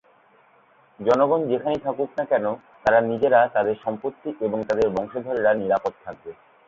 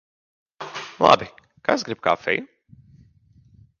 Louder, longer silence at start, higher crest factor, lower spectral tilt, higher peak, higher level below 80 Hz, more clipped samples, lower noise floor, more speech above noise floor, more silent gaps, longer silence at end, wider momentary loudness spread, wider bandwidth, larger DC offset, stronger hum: about the same, -23 LUFS vs -21 LUFS; first, 1 s vs 0.6 s; second, 18 dB vs 24 dB; first, -7 dB/octave vs -4 dB/octave; second, -4 dBFS vs 0 dBFS; about the same, -58 dBFS vs -60 dBFS; neither; about the same, -57 dBFS vs -56 dBFS; about the same, 35 dB vs 35 dB; neither; second, 0.35 s vs 1.35 s; second, 12 LU vs 18 LU; about the same, 7.4 kHz vs 7.2 kHz; neither; neither